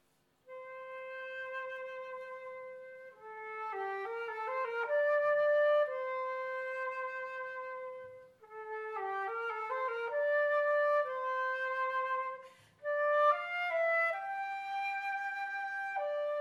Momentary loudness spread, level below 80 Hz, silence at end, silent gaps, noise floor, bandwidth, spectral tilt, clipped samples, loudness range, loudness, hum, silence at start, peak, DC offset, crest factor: 17 LU; -88 dBFS; 0 s; none; -66 dBFS; 7.6 kHz; -2.5 dB/octave; under 0.1%; 9 LU; -35 LUFS; none; 0.5 s; -18 dBFS; under 0.1%; 18 dB